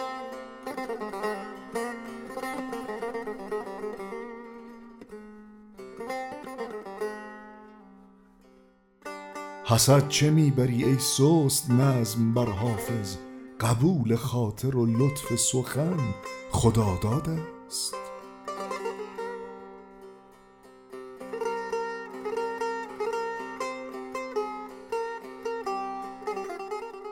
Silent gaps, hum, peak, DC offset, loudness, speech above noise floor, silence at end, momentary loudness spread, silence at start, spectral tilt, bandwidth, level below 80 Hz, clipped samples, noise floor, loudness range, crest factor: none; none; -6 dBFS; under 0.1%; -28 LUFS; 35 dB; 0 s; 21 LU; 0 s; -5 dB/octave; 18 kHz; -54 dBFS; under 0.1%; -59 dBFS; 15 LU; 22 dB